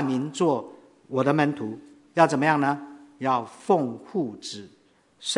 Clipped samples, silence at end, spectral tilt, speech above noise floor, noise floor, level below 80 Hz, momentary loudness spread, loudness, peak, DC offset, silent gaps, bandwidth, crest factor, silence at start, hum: under 0.1%; 0 s; -5.5 dB/octave; 24 dB; -48 dBFS; -76 dBFS; 15 LU; -25 LUFS; -2 dBFS; under 0.1%; none; 11 kHz; 24 dB; 0 s; none